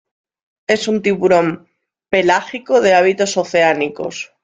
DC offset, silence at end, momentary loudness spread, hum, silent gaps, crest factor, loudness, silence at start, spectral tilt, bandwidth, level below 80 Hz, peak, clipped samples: under 0.1%; 0.2 s; 11 LU; none; none; 16 dB; -15 LUFS; 0.7 s; -4.5 dB/octave; 9.4 kHz; -58 dBFS; -2 dBFS; under 0.1%